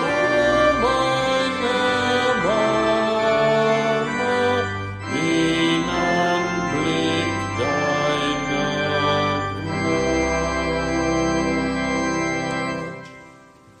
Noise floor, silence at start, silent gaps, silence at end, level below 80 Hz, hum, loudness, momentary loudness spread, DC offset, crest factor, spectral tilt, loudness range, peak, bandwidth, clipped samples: -48 dBFS; 0 s; none; 0.5 s; -42 dBFS; none; -20 LUFS; 6 LU; under 0.1%; 16 dB; -4.5 dB/octave; 3 LU; -6 dBFS; 10.5 kHz; under 0.1%